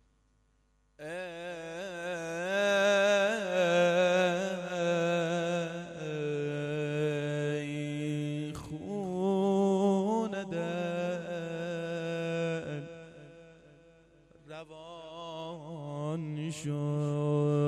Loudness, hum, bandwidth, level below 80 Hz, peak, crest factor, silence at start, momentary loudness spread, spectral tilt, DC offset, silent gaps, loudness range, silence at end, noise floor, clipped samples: -32 LUFS; none; 13 kHz; -68 dBFS; -16 dBFS; 16 dB; 1 s; 16 LU; -6 dB/octave; under 0.1%; none; 13 LU; 0 s; -70 dBFS; under 0.1%